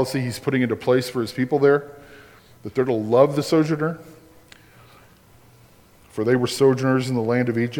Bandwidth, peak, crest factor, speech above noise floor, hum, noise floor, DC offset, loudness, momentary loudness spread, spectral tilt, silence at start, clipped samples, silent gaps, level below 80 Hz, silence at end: 18.5 kHz; -4 dBFS; 18 dB; 32 dB; none; -52 dBFS; under 0.1%; -21 LUFS; 10 LU; -6.5 dB/octave; 0 s; under 0.1%; none; -60 dBFS; 0 s